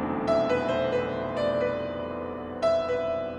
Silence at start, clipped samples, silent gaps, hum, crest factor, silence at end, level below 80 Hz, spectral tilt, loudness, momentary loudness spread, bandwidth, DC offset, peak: 0 s; under 0.1%; none; none; 14 dB; 0 s; -54 dBFS; -6.5 dB/octave; -28 LUFS; 8 LU; 10.5 kHz; under 0.1%; -14 dBFS